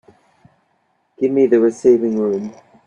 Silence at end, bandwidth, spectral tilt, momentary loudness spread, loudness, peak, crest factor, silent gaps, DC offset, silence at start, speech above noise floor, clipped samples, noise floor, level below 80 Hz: 0.35 s; 9.2 kHz; -7.5 dB/octave; 10 LU; -16 LUFS; -2 dBFS; 16 dB; none; under 0.1%; 1.2 s; 49 dB; under 0.1%; -64 dBFS; -62 dBFS